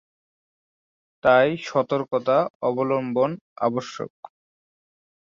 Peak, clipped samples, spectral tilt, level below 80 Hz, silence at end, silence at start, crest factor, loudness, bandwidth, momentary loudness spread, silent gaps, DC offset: -4 dBFS; under 0.1%; -6.5 dB/octave; -66 dBFS; 1.25 s; 1.25 s; 20 dB; -23 LUFS; 7.4 kHz; 11 LU; 2.50-2.60 s, 3.41-3.56 s; under 0.1%